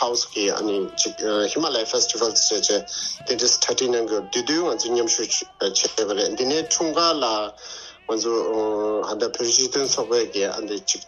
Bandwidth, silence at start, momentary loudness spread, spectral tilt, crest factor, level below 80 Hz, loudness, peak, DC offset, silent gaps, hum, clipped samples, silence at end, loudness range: 10.5 kHz; 0 s; 7 LU; -1 dB/octave; 20 dB; -62 dBFS; -21 LUFS; -4 dBFS; under 0.1%; none; none; under 0.1%; 0.05 s; 2 LU